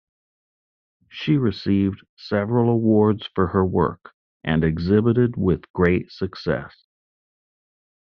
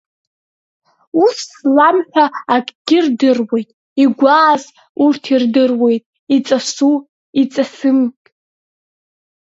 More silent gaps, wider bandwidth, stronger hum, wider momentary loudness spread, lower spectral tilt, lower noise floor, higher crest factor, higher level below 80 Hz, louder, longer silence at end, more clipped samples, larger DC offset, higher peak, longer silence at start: second, 2.09-2.17 s, 4.14-4.40 s, 5.70-5.74 s vs 2.75-2.85 s, 3.73-3.96 s, 4.89-4.95 s, 6.06-6.13 s, 6.19-6.27 s, 7.09-7.33 s; second, 6.2 kHz vs 8 kHz; neither; about the same, 11 LU vs 9 LU; first, -7 dB/octave vs -4 dB/octave; about the same, under -90 dBFS vs under -90 dBFS; about the same, 18 dB vs 14 dB; first, -50 dBFS vs -68 dBFS; second, -21 LUFS vs -14 LUFS; first, 1.5 s vs 1.35 s; neither; neither; second, -6 dBFS vs 0 dBFS; about the same, 1.15 s vs 1.15 s